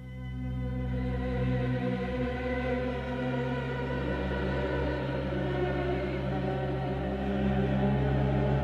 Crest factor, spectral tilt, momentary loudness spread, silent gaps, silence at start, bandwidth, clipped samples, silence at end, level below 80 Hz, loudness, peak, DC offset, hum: 14 dB; -8.5 dB/octave; 5 LU; none; 0 s; 6.6 kHz; under 0.1%; 0 s; -38 dBFS; -31 LUFS; -16 dBFS; under 0.1%; none